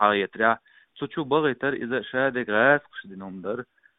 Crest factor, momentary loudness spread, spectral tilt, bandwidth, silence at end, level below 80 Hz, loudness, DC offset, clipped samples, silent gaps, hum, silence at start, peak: 20 dB; 16 LU; -3 dB/octave; 4 kHz; 0.35 s; -66 dBFS; -24 LUFS; under 0.1%; under 0.1%; none; none; 0 s; -4 dBFS